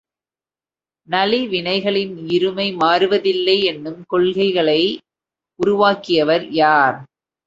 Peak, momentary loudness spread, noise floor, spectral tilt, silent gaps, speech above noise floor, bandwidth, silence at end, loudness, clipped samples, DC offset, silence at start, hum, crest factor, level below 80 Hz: 0 dBFS; 7 LU; under -90 dBFS; -6 dB/octave; none; over 73 dB; 7.6 kHz; 0.4 s; -17 LUFS; under 0.1%; under 0.1%; 1.1 s; none; 18 dB; -60 dBFS